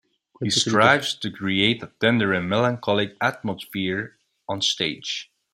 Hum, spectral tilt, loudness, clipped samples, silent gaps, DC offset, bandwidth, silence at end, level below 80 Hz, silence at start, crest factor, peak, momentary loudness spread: none; -4 dB/octave; -22 LUFS; under 0.1%; none; under 0.1%; 16 kHz; 0.3 s; -62 dBFS; 0.4 s; 22 dB; -2 dBFS; 14 LU